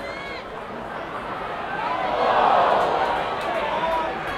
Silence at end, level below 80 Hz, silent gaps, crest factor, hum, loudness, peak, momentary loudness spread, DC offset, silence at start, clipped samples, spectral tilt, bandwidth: 0 s; -50 dBFS; none; 18 dB; none; -23 LUFS; -6 dBFS; 14 LU; under 0.1%; 0 s; under 0.1%; -4.5 dB/octave; 14.5 kHz